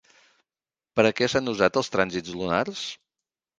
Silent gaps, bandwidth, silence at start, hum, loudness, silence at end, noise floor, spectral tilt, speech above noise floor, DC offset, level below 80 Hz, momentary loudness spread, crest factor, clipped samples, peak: none; 9.8 kHz; 0.95 s; none; -25 LUFS; 0.65 s; under -90 dBFS; -4.5 dB/octave; over 66 dB; under 0.1%; -58 dBFS; 11 LU; 24 dB; under 0.1%; -2 dBFS